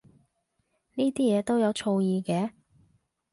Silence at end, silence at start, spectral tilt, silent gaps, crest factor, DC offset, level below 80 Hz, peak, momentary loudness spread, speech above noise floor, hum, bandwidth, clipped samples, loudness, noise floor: 0.85 s; 0.95 s; -6.5 dB/octave; none; 14 dB; under 0.1%; -68 dBFS; -14 dBFS; 7 LU; 50 dB; none; 11.5 kHz; under 0.1%; -27 LUFS; -75 dBFS